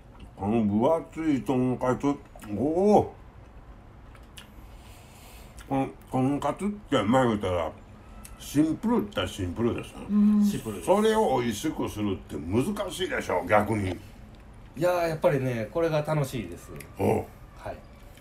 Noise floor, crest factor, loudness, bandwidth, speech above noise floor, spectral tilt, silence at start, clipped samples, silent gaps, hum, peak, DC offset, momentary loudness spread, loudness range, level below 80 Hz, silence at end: -48 dBFS; 20 dB; -27 LUFS; 15.5 kHz; 22 dB; -6.5 dB/octave; 0.1 s; under 0.1%; none; none; -8 dBFS; under 0.1%; 19 LU; 4 LU; -50 dBFS; 0 s